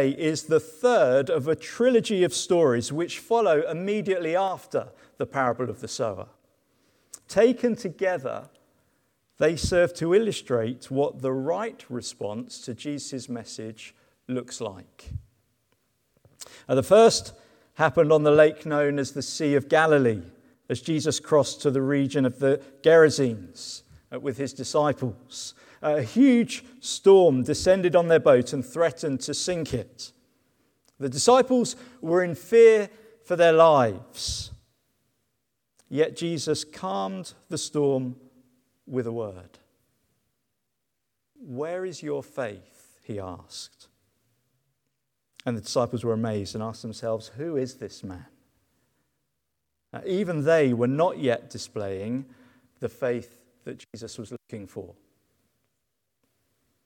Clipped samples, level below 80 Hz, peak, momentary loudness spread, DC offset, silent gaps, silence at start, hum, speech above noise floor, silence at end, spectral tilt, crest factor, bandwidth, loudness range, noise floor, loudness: under 0.1%; -56 dBFS; -4 dBFS; 20 LU; under 0.1%; none; 0 s; none; 57 dB; 2 s; -5 dB/octave; 22 dB; 17 kHz; 15 LU; -81 dBFS; -24 LUFS